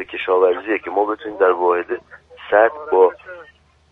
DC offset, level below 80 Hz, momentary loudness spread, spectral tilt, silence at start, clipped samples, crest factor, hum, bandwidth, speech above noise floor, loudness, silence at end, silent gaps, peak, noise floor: under 0.1%; -60 dBFS; 13 LU; -6.5 dB/octave; 0 s; under 0.1%; 18 dB; none; 3.9 kHz; 31 dB; -18 LUFS; 0.5 s; none; 0 dBFS; -48 dBFS